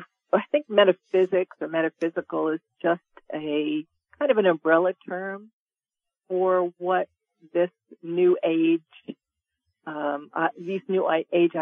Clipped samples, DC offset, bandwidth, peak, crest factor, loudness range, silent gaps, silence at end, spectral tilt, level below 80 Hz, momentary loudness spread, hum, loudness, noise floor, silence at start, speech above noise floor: under 0.1%; under 0.1%; 3.8 kHz; -6 dBFS; 20 dB; 2 LU; 5.53-5.66 s; 0 s; -8 dB/octave; -82 dBFS; 13 LU; none; -25 LUFS; -90 dBFS; 0 s; 66 dB